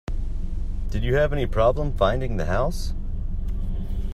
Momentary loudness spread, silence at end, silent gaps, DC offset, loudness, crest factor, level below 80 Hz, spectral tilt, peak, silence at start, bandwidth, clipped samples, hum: 11 LU; 0 s; none; under 0.1%; -26 LUFS; 18 dB; -26 dBFS; -7 dB/octave; -4 dBFS; 0.1 s; 12 kHz; under 0.1%; none